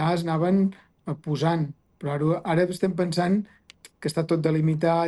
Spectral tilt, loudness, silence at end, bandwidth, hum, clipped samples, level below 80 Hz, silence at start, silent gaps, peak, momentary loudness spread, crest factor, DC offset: -7.5 dB/octave; -25 LUFS; 0 s; 12 kHz; none; under 0.1%; -62 dBFS; 0 s; none; -10 dBFS; 11 LU; 14 dB; under 0.1%